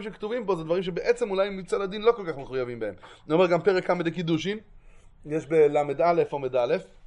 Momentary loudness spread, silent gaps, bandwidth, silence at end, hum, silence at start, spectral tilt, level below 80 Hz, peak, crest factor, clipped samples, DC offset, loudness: 11 LU; none; 10.5 kHz; 0 s; none; 0 s; -6.5 dB/octave; -56 dBFS; -8 dBFS; 18 dB; under 0.1%; under 0.1%; -26 LUFS